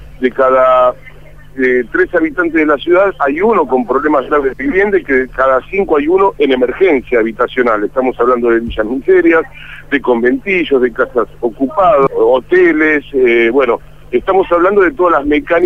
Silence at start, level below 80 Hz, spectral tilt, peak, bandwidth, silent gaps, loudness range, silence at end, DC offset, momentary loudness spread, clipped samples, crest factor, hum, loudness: 0 s; -38 dBFS; -7 dB/octave; 0 dBFS; 4.2 kHz; none; 2 LU; 0 s; 1%; 7 LU; under 0.1%; 12 dB; none; -12 LUFS